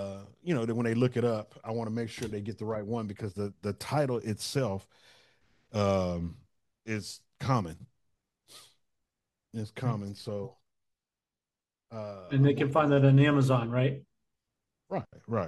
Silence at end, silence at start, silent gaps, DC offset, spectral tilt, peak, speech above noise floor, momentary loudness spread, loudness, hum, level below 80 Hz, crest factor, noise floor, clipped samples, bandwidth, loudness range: 0 s; 0 s; none; under 0.1%; -7 dB/octave; -10 dBFS; over 61 dB; 17 LU; -30 LUFS; none; -62 dBFS; 20 dB; under -90 dBFS; under 0.1%; 12.5 kHz; 13 LU